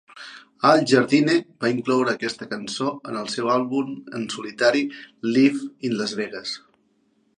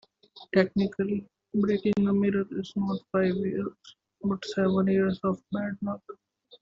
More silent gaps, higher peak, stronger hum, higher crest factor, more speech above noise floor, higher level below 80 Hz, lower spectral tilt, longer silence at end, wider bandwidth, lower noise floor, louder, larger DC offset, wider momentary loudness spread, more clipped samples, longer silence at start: neither; first, -2 dBFS vs -10 dBFS; neither; about the same, 20 dB vs 18 dB; first, 43 dB vs 27 dB; second, -72 dBFS vs -64 dBFS; second, -5 dB/octave vs -6.5 dB/octave; first, 0.8 s vs 0.45 s; first, 10.5 kHz vs 7.4 kHz; first, -65 dBFS vs -54 dBFS; first, -22 LUFS vs -28 LUFS; neither; first, 13 LU vs 10 LU; neither; second, 0.15 s vs 0.35 s